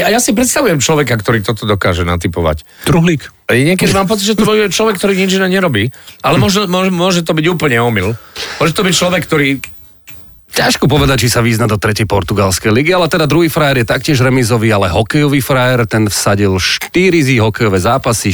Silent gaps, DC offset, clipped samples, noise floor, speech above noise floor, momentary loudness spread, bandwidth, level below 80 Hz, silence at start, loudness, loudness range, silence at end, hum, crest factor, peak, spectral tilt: none; under 0.1%; under 0.1%; -35 dBFS; 24 dB; 5 LU; 19.5 kHz; -34 dBFS; 0 s; -11 LUFS; 2 LU; 0 s; none; 10 dB; -2 dBFS; -4.5 dB/octave